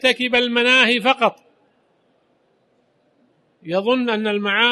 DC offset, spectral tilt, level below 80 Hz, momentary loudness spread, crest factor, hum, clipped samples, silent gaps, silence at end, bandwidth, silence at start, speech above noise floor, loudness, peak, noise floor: under 0.1%; -3.5 dB/octave; -64 dBFS; 8 LU; 20 dB; none; under 0.1%; none; 0 s; 12 kHz; 0.05 s; 45 dB; -17 LUFS; -2 dBFS; -62 dBFS